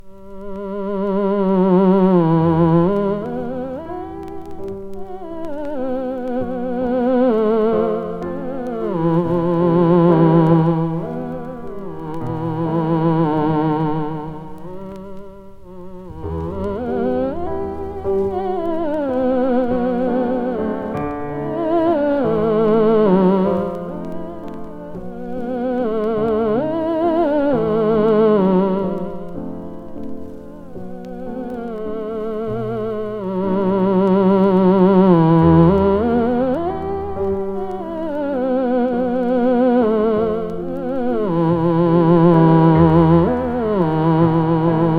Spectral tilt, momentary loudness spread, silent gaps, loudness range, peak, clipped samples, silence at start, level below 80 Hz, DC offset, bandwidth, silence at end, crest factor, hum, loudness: -10.5 dB/octave; 18 LU; none; 11 LU; 0 dBFS; under 0.1%; 0.05 s; -42 dBFS; under 0.1%; 4.8 kHz; 0 s; 16 dB; none; -17 LUFS